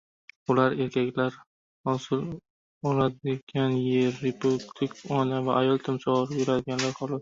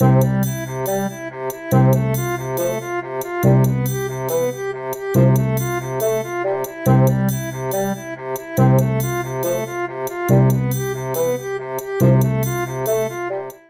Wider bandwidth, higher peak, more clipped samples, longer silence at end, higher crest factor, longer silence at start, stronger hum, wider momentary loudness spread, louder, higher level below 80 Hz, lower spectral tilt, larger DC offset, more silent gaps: second, 7.8 kHz vs 16.5 kHz; second, -8 dBFS vs -2 dBFS; neither; about the same, 0 s vs 0.1 s; about the same, 20 dB vs 16 dB; first, 0.5 s vs 0 s; neither; about the same, 8 LU vs 10 LU; second, -27 LUFS vs -19 LUFS; second, -62 dBFS vs -44 dBFS; about the same, -6.5 dB/octave vs -7 dB/octave; neither; first, 1.47-1.84 s, 2.50-2.81 s, 3.43-3.47 s vs none